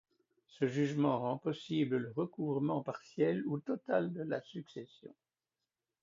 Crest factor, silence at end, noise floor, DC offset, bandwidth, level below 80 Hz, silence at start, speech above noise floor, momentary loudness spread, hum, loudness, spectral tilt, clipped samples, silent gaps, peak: 18 dB; 0.95 s; under -90 dBFS; under 0.1%; 7.4 kHz; -80 dBFS; 0.55 s; over 54 dB; 12 LU; none; -36 LUFS; -6.5 dB/octave; under 0.1%; none; -18 dBFS